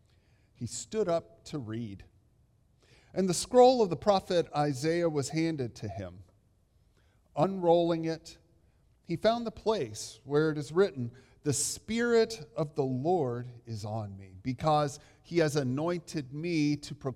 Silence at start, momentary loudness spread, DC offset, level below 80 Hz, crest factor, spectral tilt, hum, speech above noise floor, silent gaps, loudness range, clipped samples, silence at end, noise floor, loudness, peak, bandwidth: 0.6 s; 15 LU; under 0.1%; -62 dBFS; 20 dB; -5.5 dB/octave; none; 37 dB; none; 5 LU; under 0.1%; 0 s; -67 dBFS; -30 LUFS; -10 dBFS; 15.5 kHz